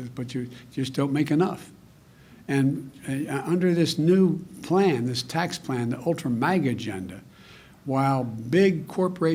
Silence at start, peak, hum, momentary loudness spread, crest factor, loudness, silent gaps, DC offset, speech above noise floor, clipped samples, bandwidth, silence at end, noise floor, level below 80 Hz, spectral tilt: 0 s; -10 dBFS; none; 13 LU; 16 dB; -25 LUFS; none; under 0.1%; 28 dB; under 0.1%; 16 kHz; 0 s; -52 dBFS; -62 dBFS; -6.5 dB/octave